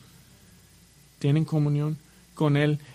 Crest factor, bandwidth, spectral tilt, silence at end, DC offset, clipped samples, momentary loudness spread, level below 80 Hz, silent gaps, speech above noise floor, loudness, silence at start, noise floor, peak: 18 dB; 11.5 kHz; -8 dB/octave; 0 s; under 0.1%; under 0.1%; 8 LU; -62 dBFS; none; 32 dB; -25 LUFS; 1.2 s; -55 dBFS; -10 dBFS